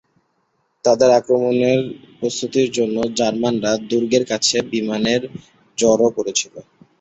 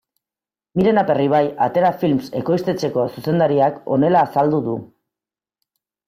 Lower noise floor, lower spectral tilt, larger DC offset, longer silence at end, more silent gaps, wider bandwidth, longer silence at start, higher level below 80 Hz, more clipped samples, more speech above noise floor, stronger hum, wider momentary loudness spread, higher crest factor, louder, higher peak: second, -67 dBFS vs under -90 dBFS; second, -4 dB/octave vs -8 dB/octave; neither; second, 0.4 s vs 1.2 s; neither; second, 8.2 kHz vs 16 kHz; about the same, 0.85 s vs 0.75 s; about the same, -56 dBFS vs -58 dBFS; neither; second, 49 dB vs over 73 dB; neither; first, 9 LU vs 6 LU; about the same, 18 dB vs 14 dB; about the same, -18 LUFS vs -18 LUFS; about the same, -2 dBFS vs -4 dBFS